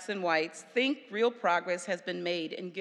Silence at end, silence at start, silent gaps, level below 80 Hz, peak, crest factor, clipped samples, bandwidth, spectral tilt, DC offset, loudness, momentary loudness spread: 0 s; 0 s; none; under -90 dBFS; -14 dBFS; 18 dB; under 0.1%; 11.5 kHz; -4 dB/octave; under 0.1%; -31 LUFS; 5 LU